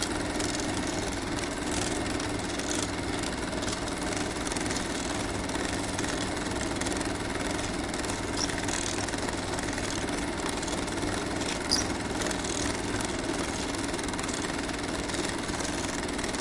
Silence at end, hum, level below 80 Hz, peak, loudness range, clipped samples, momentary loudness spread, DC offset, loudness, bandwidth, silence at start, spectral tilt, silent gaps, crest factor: 0 s; none; -44 dBFS; -10 dBFS; 1 LU; under 0.1%; 2 LU; under 0.1%; -30 LUFS; 11.5 kHz; 0 s; -3.5 dB/octave; none; 22 dB